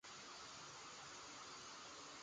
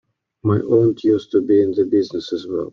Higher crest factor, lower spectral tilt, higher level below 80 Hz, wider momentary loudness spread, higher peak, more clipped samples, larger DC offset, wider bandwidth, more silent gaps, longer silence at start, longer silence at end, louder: about the same, 12 dB vs 14 dB; second, -1 dB/octave vs -8.5 dB/octave; second, -82 dBFS vs -58 dBFS; second, 1 LU vs 9 LU; second, -44 dBFS vs -4 dBFS; neither; neither; first, 10 kHz vs 7 kHz; neither; second, 0.05 s vs 0.45 s; about the same, 0 s vs 0.05 s; second, -54 LUFS vs -18 LUFS